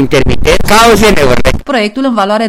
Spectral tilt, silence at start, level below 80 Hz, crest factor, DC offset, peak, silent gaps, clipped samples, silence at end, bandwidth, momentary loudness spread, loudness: -4.5 dB/octave; 0 s; -18 dBFS; 6 dB; under 0.1%; 0 dBFS; none; under 0.1%; 0 s; 17 kHz; 7 LU; -8 LUFS